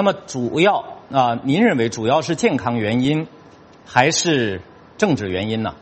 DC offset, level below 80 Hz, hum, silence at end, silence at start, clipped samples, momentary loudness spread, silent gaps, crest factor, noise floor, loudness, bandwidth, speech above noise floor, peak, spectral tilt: under 0.1%; -54 dBFS; none; 0.05 s; 0 s; under 0.1%; 8 LU; none; 18 dB; -45 dBFS; -19 LUFS; 8.8 kHz; 27 dB; 0 dBFS; -4.5 dB/octave